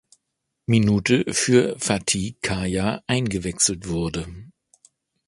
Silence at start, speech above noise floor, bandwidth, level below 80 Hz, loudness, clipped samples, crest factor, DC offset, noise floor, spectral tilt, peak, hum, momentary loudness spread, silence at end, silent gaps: 0.7 s; 57 dB; 11.5 kHz; -44 dBFS; -22 LUFS; under 0.1%; 20 dB; under 0.1%; -79 dBFS; -4.5 dB/octave; -2 dBFS; none; 8 LU; 0.8 s; none